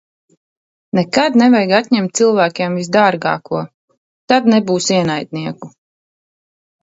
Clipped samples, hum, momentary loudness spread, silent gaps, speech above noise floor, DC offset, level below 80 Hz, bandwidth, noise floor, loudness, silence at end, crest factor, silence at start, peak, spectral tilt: under 0.1%; none; 13 LU; 3.74-3.88 s, 3.97-4.28 s; over 76 dB; under 0.1%; -60 dBFS; 8 kHz; under -90 dBFS; -14 LUFS; 1.15 s; 16 dB; 0.95 s; 0 dBFS; -5 dB/octave